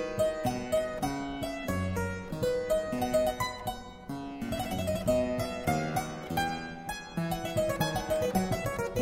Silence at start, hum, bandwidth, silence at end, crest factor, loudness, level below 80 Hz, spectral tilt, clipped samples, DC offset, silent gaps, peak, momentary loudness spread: 0 s; none; 16 kHz; 0 s; 18 dB; -32 LUFS; -48 dBFS; -5.5 dB/octave; under 0.1%; under 0.1%; none; -14 dBFS; 9 LU